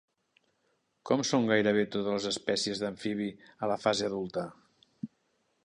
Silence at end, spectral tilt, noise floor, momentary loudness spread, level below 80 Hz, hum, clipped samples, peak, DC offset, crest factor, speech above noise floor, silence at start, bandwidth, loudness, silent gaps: 0.6 s; -4 dB/octave; -75 dBFS; 19 LU; -70 dBFS; none; under 0.1%; -12 dBFS; under 0.1%; 20 dB; 45 dB; 1.05 s; 11 kHz; -30 LUFS; none